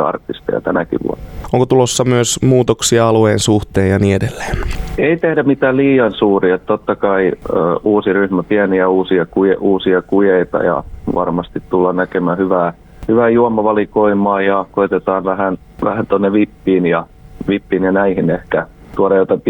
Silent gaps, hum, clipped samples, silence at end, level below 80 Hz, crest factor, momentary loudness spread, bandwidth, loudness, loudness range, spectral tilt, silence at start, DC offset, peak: none; none; under 0.1%; 0 s; -34 dBFS; 14 dB; 8 LU; 19 kHz; -14 LUFS; 2 LU; -5.5 dB/octave; 0 s; under 0.1%; 0 dBFS